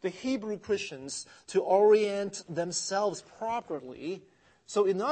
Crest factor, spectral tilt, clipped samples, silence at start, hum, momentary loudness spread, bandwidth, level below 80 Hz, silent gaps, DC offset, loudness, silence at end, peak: 18 dB; -4 dB/octave; under 0.1%; 0 s; none; 16 LU; 8.8 kHz; -72 dBFS; none; under 0.1%; -30 LUFS; 0 s; -12 dBFS